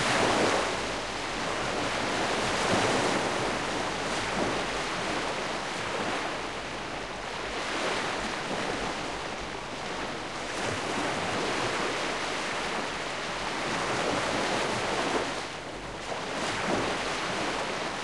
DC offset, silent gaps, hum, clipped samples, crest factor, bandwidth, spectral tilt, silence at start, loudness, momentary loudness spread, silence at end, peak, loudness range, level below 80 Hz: 0.3%; none; none; under 0.1%; 18 dB; 13 kHz; -3 dB/octave; 0 s; -30 LUFS; 8 LU; 0 s; -12 dBFS; 4 LU; -52 dBFS